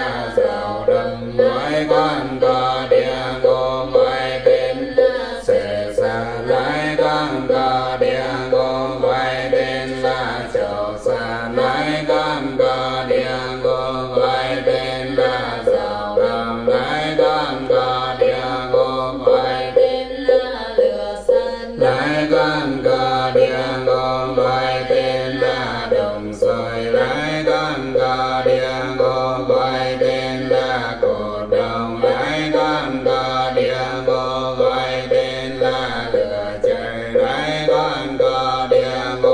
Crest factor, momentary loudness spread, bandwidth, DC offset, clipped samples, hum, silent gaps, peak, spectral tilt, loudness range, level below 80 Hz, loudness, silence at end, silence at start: 16 dB; 4 LU; 10 kHz; under 0.1%; under 0.1%; none; none; -2 dBFS; -5.5 dB/octave; 2 LU; -42 dBFS; -18 LUFS; 0 s; 0 s